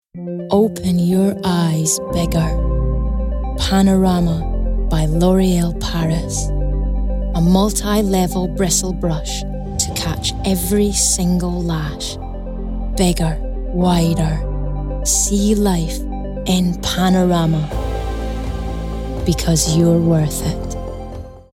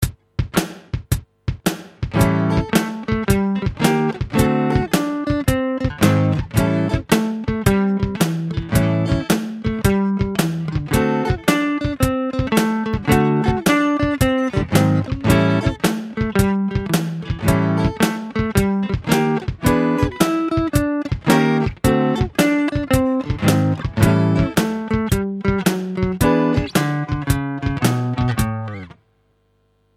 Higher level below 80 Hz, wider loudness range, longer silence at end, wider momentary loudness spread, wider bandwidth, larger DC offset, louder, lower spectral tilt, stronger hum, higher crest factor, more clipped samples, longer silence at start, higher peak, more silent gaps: first, -24 dBFS vs -32 dBFS; about the same, 2 LU vs 2 LU; second, 0.15 s vs 1.1 s; first, 11 LU vs 6 LU; about the same, 16.5 kHz vs 16 kHz; neither; about the same, -18 LUFS vs -19 LUFS; about the same, -5 dB/octave vs -6 dB/octave; neither; about the same, 16 dB vs 18 dB; neither; first, 0.15 s vs 0 s; about the same, 0 dBFS vs 0 dBFS; neither